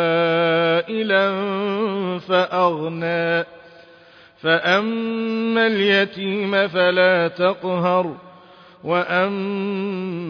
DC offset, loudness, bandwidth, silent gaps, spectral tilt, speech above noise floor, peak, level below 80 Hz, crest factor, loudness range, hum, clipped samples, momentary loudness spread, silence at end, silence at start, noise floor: under 0.1%; -19 LUFS; 5.4 kHz; none; -7 dB/octave; 29 dB; -2 dBFS; -66 dBFS; 18 dB; 3 LU; none; under 0.1%; 8 LU; 0 s; 0 s; -48 dBFS